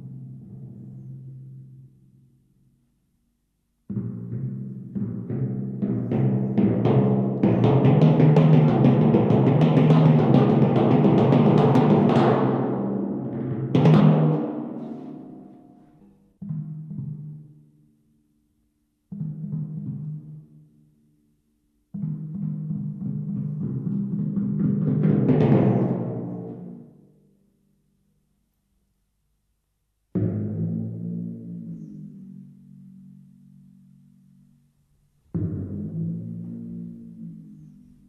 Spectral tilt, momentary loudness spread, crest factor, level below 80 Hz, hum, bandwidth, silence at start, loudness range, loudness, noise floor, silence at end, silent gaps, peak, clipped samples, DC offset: -10.5 dB/octave; 23 LU; 20 dB; -56 dBFS; none; 5.4 kHz; 0 s; 21 LU; -22 LUFS; -73 dBFS; 0.45 s; none; -4 dBFS; under 0.1%; under 0.1%